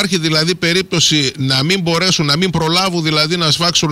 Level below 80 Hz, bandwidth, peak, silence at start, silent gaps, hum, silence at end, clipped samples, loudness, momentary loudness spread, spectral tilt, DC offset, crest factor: -44 dBFS; 16 kHz; -4 dBFS; 0 s; none; none; 0 s; under 0.1%; -13 LUFS; 2 LU; -3.5 dB/octave; under 0.1%; 12 dB